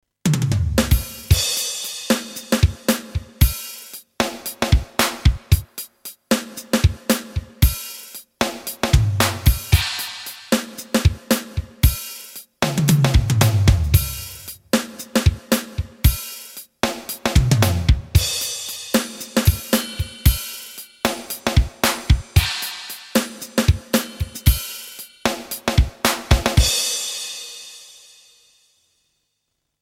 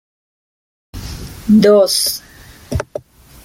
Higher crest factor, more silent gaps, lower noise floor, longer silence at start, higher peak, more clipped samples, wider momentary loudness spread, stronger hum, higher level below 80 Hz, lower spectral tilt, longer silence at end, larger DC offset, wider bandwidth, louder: about the same, 20 dB vs 16 dB; neither; first, -75 dBFS vs -32 dBFS; second, 0.25 s vs 0.95 s; about the same, 0 dBFS vs -2 dBFS; neither; second, 14 LU vs 21 LU; neither; first, -26 dBFS vs -38 dBFS; about the same, -4.5 dB/octave vs -4.5 dB/octave; first, 1.95 s vs 0.45 s; neither; about the same, 17 kHz vs 17 kHz; second, -20 LUFS vs -13 LUFS